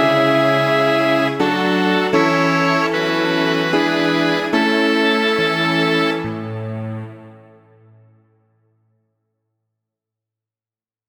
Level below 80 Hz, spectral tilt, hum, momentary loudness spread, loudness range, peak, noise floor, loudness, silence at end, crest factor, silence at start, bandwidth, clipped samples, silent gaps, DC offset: -62 dBFS; -5.5 dB/octave; none; 12 LU; 14 LU; -2 dBFS; under -90 dBFS; -16 LUFS; 3.75 s; 16 dB; 0 s; 19.5 kHz; under 0.1%; none; under 0.1%